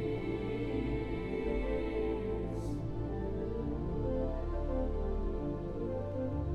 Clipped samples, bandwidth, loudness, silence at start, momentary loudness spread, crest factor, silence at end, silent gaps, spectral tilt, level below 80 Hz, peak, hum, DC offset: under 0.1%; 9.6 kHz; -37 LUFS; 0 s; 3 LU; 12 dB; 0 s; none; -9 dB/octave; -40 dBFS; -22 dBFS; none; under 0.1%